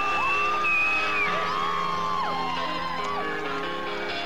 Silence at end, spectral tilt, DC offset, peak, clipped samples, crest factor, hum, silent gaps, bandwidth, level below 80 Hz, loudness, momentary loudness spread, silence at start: 0 s; -3.5 dB/octave; 2%; -14 dBFS; under 0.1%; 12 dB; none; none; 16 kHz; -54 dBFS; -25 LUFS; 8 LU; 0 s